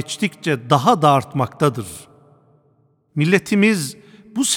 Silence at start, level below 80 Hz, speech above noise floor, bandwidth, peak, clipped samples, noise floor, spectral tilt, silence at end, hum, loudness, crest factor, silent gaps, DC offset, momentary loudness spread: 0 s; -60 dBFS; 42 dB; 19 kHz; 0 dBFS; under 0.1%; -59 dBFS; -4.5 dB/octave; 0 s; none; -18 LUFS; 20 dB; none; under 0.1%; 15 LU